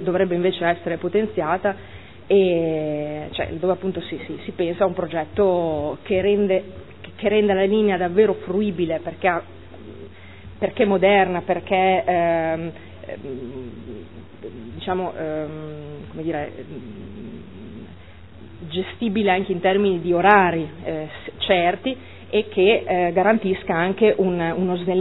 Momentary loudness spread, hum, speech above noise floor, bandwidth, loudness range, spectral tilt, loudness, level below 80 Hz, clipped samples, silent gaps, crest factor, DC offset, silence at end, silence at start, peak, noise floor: 20 LU; none; 22 dB; 4.1 kHz; 10 LU; -10 dB/octave; -21 LUFS; -52 dBFS; under 0.1%; none; 22 dB; 0.5%; 0 s; 0 s; 0 dBFS; -43 dBFS